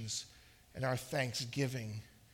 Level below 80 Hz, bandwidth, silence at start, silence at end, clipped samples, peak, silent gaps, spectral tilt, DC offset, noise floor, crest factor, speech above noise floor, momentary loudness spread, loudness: -66 dBFS; 17.5 kHz; 0 s; 0 s; under 0.1%; -22 dBFS; none; -4 dB/octave; under 0.1%; -61 dBFS; 18 dB; 23 dB; 14 LU; -39 LUFS